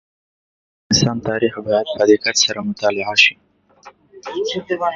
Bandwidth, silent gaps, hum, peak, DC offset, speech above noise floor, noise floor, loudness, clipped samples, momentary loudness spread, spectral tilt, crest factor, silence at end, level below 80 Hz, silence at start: 7.8 kHz; none; none; 0 dBFS; under 0.1%; 29 dB; -46 dBFS; -17 LUFS; under 0.1%; 10 LU; -3 dB/octave; 20 dB; 0 s; -52 dBFS; 0.9 s